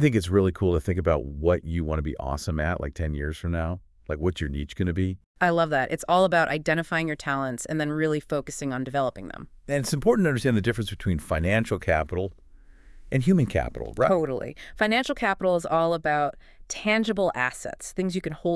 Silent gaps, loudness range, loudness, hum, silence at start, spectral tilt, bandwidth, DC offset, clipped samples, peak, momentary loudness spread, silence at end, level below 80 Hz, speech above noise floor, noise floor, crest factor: 5.26-5.35 s; 4 LU; -26 LUFS; none; 0 s; -6 dB/octave; 12 kHz; under 0.1%; under 0.1%; -6 dBFS; 9 LU; 0 s; -42 dBFS; 24 dB; -49 dBFS; 20 dB